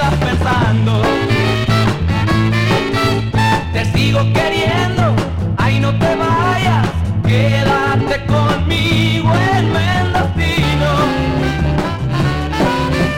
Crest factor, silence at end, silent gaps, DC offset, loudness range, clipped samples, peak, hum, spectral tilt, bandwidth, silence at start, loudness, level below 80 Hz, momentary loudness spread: 10 dB; 0 s; none; under 0.1%; 1 LU; under 0.1%; -4 dBFS; none; -6.5 dB/octave; 14.5 kHz; 0 s; -14 LUFS; -28 dBFS; 3 LU